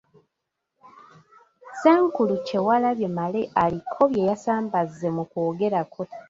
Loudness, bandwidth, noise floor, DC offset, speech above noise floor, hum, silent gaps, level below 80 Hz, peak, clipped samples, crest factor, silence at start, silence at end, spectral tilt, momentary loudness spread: -23 LUFS; 7.8 kHz; -81 dBFS; under 0.1%; 59 dB; none; none; -62 dBFS; -4 dBFS; under 0.1%; 20 dB; 1.65 s; 0.1 s; -7.5 dB/octave; 8 LU